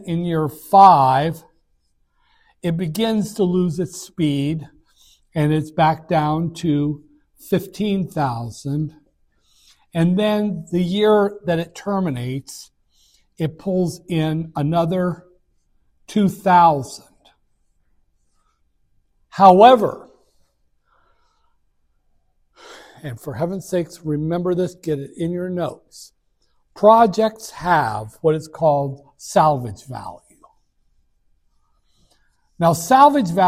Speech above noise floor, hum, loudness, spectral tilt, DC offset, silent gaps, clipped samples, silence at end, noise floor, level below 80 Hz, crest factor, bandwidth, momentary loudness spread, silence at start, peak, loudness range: 46 dB; none; -18 LUFS; -6.5 dB/octave; under 0.1%; none; under 0.1%; 0 s; -64 dBFS; -54 dBFS; 20 dB; 16 kHz; 17 LU; 0 s; 0 dBFS; 8 LU